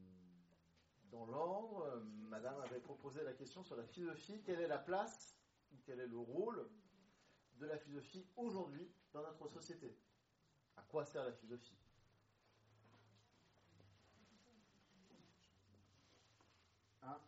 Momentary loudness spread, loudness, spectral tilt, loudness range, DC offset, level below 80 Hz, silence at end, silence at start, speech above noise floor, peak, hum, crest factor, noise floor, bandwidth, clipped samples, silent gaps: 17 LU; -50 LUFS; -5 dB/octave; 6 LU; under 0.1%; -88 dBFS; 0 s; 0 s; 31 dB; -30 dBFS; none; 22 dB; -80 dBFS; 7.6 kHz; under 0.1%; none